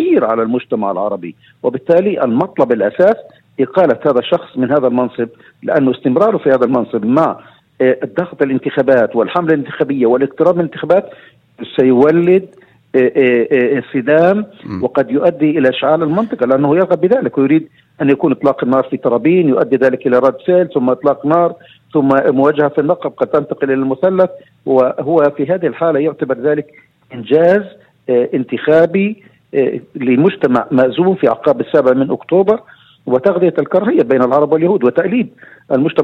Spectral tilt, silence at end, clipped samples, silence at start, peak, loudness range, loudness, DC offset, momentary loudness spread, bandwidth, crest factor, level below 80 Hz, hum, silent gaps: -9 dB/octave; 0 s; under 0.1%; 0 s; 0 dBFS; 2 LU; -13 LUFS; under 0.1%; 7 LU; 5.6 kHz; 14 dB; -58 dBFS; none; none